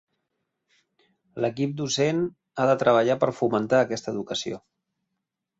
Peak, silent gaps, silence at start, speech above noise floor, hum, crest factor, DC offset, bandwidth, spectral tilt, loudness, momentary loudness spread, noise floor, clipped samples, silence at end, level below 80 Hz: -6 dBFS; none; 1.35 s; 59 dB; none; 20 dB; under 0.1%; 8 kHz; -5 dB/octave; -24 LUFS; 11 LU; -82 dBFS; under 0.1%; 1 s; -66 dBFS